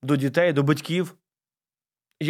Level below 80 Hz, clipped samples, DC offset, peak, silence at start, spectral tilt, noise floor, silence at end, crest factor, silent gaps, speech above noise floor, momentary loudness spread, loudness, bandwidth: -74 dBFS; under 0.1%; under 0.1%; -8 dBFS; 0.05 s; -6.5 dB/octave; under -90 dBFS; 0 s; 18 dB; none; over 68 dB; 7 LU; -23 LUFS; 15 kHz